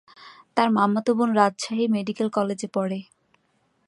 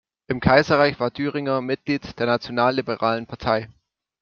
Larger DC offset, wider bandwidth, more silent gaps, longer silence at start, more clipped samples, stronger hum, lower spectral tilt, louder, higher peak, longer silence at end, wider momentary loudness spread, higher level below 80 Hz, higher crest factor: neither; first, 11 kHz vs 7 kHz; neither; about the same, 0.2 s vs 0.3 s; neither; neither; about the same, -5.5 dB/octave vs -6.5 dB/octave; about the same, -23 LUFS vs -22 LUFS; about the same, -4 dBFS vs -2 dBFS; first, 0.85 s vs 0.55 s; about the same, 8 LU vs 9 LU; second, -74 dBFS vs -48 dBFS; about the same, 20 dB vs 20 dB